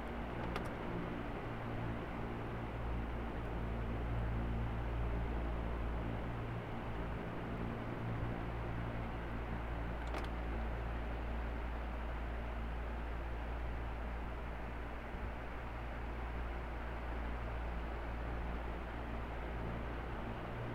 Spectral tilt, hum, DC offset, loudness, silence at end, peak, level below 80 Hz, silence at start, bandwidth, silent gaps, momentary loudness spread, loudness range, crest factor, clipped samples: -8 dB/octave; none; under 0.1%; -43 LUFS; 0 s; -26 dBFS; -44 dBFS; 0 s; 6.4 kHz; none; 4 LU; 3 LU; 14 dB; under 0.1%